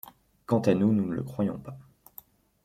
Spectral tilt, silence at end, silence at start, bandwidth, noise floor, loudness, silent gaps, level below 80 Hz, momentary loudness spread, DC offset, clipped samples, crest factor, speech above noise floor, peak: -8.5 dB/octave; 0.85 s; 0.05 s; 16 kHz; -54 dBFS; -27 LUFS; none; -62 dBFS; 25 LU; under 0.1%; under 0.1%; 20 dB; 27 dB; -10 dBFS